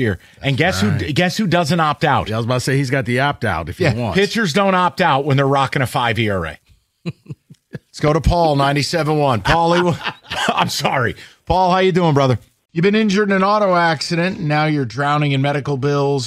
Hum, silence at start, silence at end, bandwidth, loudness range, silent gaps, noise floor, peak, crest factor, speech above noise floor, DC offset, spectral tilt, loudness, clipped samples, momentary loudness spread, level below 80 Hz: none; 0 s; 0 s; 15 kHz; 3 LU; none; -37 dBFS; -2 dBFS; 14 dB; 20 dB; under 0.1%; -5.5 dB/octave; -17 LUFS; under 0.1%; 8 LU; -36 dBFS